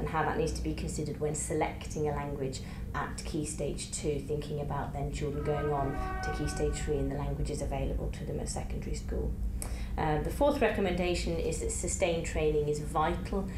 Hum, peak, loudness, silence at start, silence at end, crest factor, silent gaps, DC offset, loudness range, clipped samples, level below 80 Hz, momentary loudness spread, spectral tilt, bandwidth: none; -14 dBFS; -33 LUFS; 0 s; 0 s; 18 dB; none; under 0.1%; 5 LU; under 0.1%; -38 dBFS; 7 LU; -5.5 dB/octave; 15 kHz